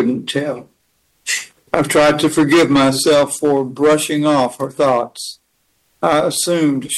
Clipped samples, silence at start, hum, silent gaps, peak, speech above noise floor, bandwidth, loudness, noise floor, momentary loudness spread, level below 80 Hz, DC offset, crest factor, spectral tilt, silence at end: under 0.1%; 0 s; none; none; 0 dBFS; 48 dB; 13 kHz; -15 LUFS; -63 dBFS; 10 LU; -50 dBFS; under 0.1%; 16 dB; -4 dB/octave; 0 s